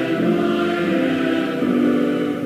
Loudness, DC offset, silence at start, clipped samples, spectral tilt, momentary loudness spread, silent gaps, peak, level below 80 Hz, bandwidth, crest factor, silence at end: -19 LUFS; under 0.1%; 0 s; under 0.1%; -7 dB/octave; 3 LU; none; -6 dBFS; -56 dBFS; 15.5 kHz; 12 dB; 0 s